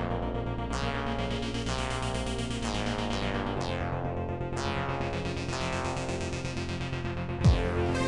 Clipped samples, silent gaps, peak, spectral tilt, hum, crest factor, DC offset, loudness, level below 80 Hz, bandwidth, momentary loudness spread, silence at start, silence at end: under 0.1%; none; -10 dBFS; -5.5 dB/octave; none; 20 dB; under 0.1%; -32 LUFS; -38 dBFS; 11.5 kHz; 6 LU; 0 s; 0 s